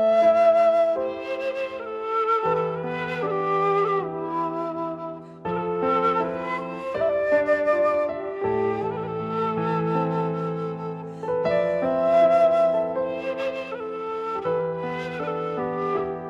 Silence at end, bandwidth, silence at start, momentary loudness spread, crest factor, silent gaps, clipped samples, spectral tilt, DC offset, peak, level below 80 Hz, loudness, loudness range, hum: 0 s; 7.6 kHz; 0 s; 12 LU; 14 dB; none; under 0.1%; -7.5 dB/octave; under 0.1%; -8 dBFS; -60 dBFS; -24 LUFS; 4 LU; none